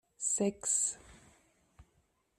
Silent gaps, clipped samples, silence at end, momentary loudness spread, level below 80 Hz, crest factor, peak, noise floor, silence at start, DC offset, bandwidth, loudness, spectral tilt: none; under 0.1%; 0.55 s; 6 LU; -68 dBFS; 20 dB; -18 dBFS; -75 dBFS; 0.2 s; under 0.1%; 14 kHz; -32 LUFS; -3 dB/octave